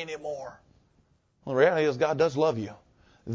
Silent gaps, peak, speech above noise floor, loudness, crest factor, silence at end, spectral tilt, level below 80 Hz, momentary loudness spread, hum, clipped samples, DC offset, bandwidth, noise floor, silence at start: none; -8 dBFS; 41 dB; -26 LUFS; 20 dB; 0 s; -6 dB/octave; -64 dBFS; 21 LU; none; under 0.1%; under 0.1%; 7.6 kHz; -67 dBFS; 0 s